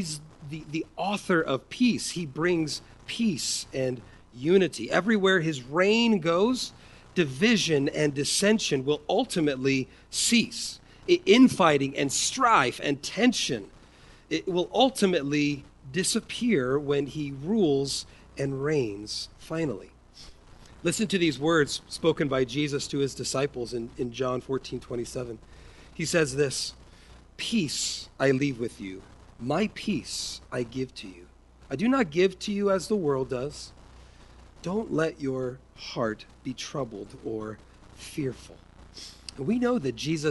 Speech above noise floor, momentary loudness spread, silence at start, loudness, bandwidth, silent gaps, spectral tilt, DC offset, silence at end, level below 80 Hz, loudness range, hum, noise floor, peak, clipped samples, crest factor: 26 dB; 14 LU; 0 s; -27 LUFS; 11.5 kHz; none; -4 dB/octave; under 0.1%; 0 s; -54 dBFS; 9 LU; none; -53 dBFS; -6 dBFS; under 0.1%; 22 dB